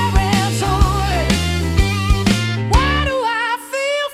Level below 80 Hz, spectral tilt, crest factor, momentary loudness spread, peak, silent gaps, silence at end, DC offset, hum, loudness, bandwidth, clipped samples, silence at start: -22 dBFS; -5 dB/octave; 16 dB; 4 LU; 0 dBFS; none; 0 s; under 0.1%; none; -17 LUFS; 15.5 kHz; under 0.1%; 0 s